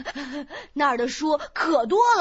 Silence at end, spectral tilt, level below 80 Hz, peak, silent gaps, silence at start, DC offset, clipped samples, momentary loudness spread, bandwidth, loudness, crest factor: 0 s; -3 dB/octave; -56 dBFS; -8 dBFS; none; 0 s; under 0.1%; under 0.1%; 15 LU; 8 kHz; -23 LUFS; 16 dB